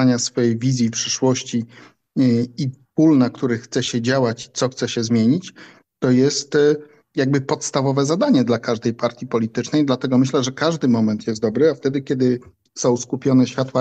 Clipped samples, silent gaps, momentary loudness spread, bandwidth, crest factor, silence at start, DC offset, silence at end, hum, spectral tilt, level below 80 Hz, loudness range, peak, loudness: under 0.1%; none; 7 LU; 8.8 kHz; 14 dB; 0 s; under 0.1%; 0 s; none; -5.5 dB/octave; -62 dBFS; 1 LU; -4 dBFS; -19 LUFS